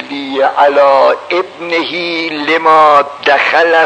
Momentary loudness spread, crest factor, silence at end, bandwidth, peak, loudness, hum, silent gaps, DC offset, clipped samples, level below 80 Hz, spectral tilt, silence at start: 9 LU; 10 dB; 0 s; 9.2 kHz; 0 dBFS; -10 LUFS; none; none; under 0.1%; 0.6%; -62 dBFS; -3.5 dB/octave; 0 s